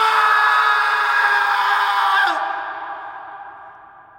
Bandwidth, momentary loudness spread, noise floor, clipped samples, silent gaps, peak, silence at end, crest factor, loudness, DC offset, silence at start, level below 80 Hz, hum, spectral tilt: 19.5 kHz; 20 LU; -43 dBFS; under 0.1%; none; -4 dBFS; 0.4 s; 14 dB; -16 LUFS; under 0.1%; 0 s; -70 dBFS; none; 0.5 dB/octave